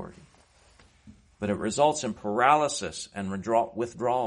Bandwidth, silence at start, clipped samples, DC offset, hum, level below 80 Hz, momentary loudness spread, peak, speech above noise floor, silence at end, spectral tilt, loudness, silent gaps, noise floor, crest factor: 10.5 kHz; 0 s; under 0.1%; under 0.1%; none; -60 dBFS; 13 LU; -6 dBFS; 33 dB; 0 s; -4 dB/octave; -27 LUFS; none; -59 dBFS; 22 dB